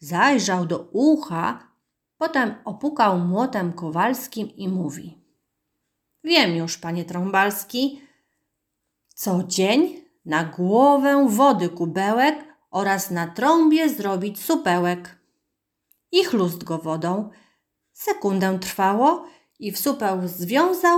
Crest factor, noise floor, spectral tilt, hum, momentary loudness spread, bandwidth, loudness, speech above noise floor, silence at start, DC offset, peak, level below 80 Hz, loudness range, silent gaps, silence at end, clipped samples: 18 dB; -79 dBFS; -5 dB/octave; none; 11 LU; over 20 kHz; -21 LUFS; 58 dB; 0 s; under 0.1%; -4 dBFS; -70 dBFS; 5 LU; none; 0 s; under 0.1%